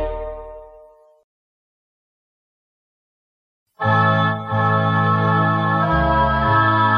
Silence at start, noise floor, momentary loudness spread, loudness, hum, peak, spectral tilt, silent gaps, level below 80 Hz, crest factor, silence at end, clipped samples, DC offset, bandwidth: 0 s; -48 dBFS; 13 LU; -17 LUFS; none; -4 dBFS; -8.5 dB/octave; 1.24-3.66 s; -36 dBFS; 16 dB; 0 s; under 0.1%; under 0.1%; 5.4 kHz